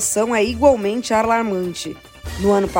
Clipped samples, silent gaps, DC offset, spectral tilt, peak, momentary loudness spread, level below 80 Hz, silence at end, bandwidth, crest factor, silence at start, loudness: under 0.1%; none; under 0.1%; -4 dB/octave; -2 dBFS; 15 LU; -38 dBFS; 0 s; 16.5 kHz; 16 dB; 0 s; -18 LUFS